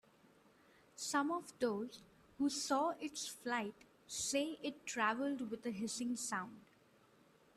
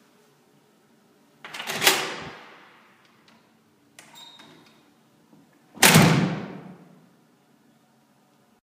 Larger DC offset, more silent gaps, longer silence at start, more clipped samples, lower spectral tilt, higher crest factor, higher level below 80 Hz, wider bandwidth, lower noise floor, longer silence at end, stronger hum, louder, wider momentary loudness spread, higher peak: neither; neither; second, 1 s vs 1.45 s; neither; about the same, -2.5 dB/octave vs -3.5 dB/octave; second, 20 dB vs 28 dB; second, -80 dBFS vs -58 dBFS; second, 14 kHz vs 15.5 kHz; first, -69 dBFS vs -61 dBFS; second, 0.95 s vs 1.9 s; neither; second, -40 LUFS vs -19 LUFS; second, 10 LU vs 30 LU; second, -22 dBFS vs 0 dBFS